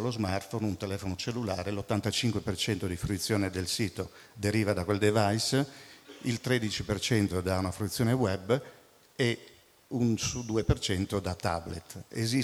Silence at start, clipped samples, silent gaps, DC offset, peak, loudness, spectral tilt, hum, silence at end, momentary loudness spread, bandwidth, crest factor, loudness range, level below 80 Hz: 0 s; under 0.1%; none; under 0.1%; -12 dBFS; -31 LUFS; -5 dB/octave; none; 0 s; 9 LU; 16 kHz; 20 dB; 2 LU; -50 dBFS